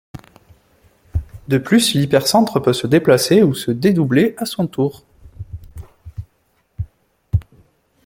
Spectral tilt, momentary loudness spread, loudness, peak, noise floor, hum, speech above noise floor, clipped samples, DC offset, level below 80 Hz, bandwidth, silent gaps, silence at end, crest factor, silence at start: -5.5 dB/octave; 22 LU; -16 LUFS; -2 dBFS; -62 dBFS; none; 48 dB; under 0.1%; under 0.1%; -40 dBFS; 17 kHz; none; 0.65 s; 16 dB; 0.15 s